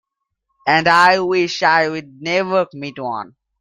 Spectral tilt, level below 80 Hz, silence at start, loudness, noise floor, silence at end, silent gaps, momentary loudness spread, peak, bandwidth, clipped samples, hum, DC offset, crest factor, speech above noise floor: -4.5 dB/octave; -60 dBFS; 0.65 s; -16 LUFS; -74 dBFS; 0.35 s; none; 15 LU; 0 dBFS; 11 kHz; under 0.1%; none; under 0.1%; 18 dB; 58 dB